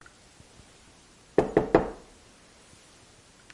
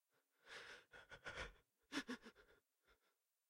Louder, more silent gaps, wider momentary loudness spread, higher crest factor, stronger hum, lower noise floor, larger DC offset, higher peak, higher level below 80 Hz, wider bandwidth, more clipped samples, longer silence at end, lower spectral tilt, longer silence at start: first, -26 LUFS vs -54 LUFS; neither; first, 15 LU vs 12 LU; about the same, 26 dB vs 24 dB; neither; second, -56 dBFS vs -88 dBFS; neither; first, -6 dBFS vs -34 dBFS; first, -50 dBFS vs -74 dBFS; second, 11.5 kHz vs 16 kHz; neither; first, 1.55 s vs 0.55 s; first, -7 dB/octave vs -3 dB/octave; first, 1.4 s vs 0.45 s